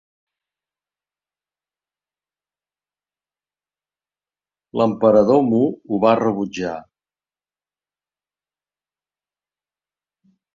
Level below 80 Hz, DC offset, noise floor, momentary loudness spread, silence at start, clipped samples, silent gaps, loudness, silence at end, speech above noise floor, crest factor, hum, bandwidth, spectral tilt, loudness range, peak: -62 dBFS; under 0.1%; under -90 dBFS; 13 LU; 4.75 s; under 0.1%; none; -18 LUFS; 3.75 s; over 73 dB; 22 dB; 50 Hz at -55 dBFS; 7.4 kHz; -7.5 dB/octave; 11 LU; -2 dBFS